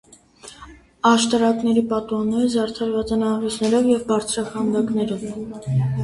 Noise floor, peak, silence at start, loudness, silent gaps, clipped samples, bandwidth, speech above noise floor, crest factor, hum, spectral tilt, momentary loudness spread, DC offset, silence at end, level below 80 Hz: -45 dBFS; -4 dBFS; 0.45 s; -21 LUFS; none; under 0.1%; 11.5 kHz; 25 dB; 16 dB; none; -5.5 dB/octave; 8 LU; under 0.1%; 0 s; -50 dBFS